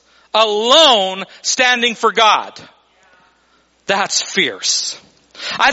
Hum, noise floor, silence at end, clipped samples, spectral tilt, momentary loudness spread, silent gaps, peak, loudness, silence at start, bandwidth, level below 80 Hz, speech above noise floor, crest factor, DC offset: none; -56 dBFS; 0 s; under 0.1%; -0.5 dB/octave; 15 LU; none; 0 dBFS; -13 LUFS; 0.35 s; 8.2 kHz; -60 dBFS; 42 dB; 16 dB; under 0.1%